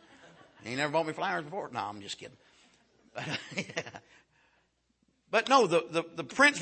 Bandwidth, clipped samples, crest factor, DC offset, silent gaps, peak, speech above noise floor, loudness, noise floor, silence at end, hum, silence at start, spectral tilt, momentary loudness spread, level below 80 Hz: 8.8 kHz; under 0.1%; 22 dB; under 0.1%; none; -10 dBFS; 43 dB; -30 LUFS; -74 dBFS; 0 s; none; 0.65 s; -3.5 dB/octave; 21 LU; -76 dBFS